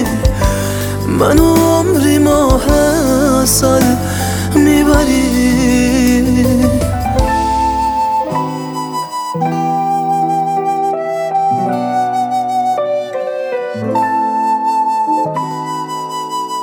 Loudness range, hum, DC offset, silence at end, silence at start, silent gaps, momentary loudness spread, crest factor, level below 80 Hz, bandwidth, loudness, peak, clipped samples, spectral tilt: 5 LU; none; under 0.1%; 0 s; 0 s; none; 9 LU; 12 dB; -26 dBFS; over 20 kHz; -13 LUFS; 0 dBFS; under 0.1%; -5.5 dB/octave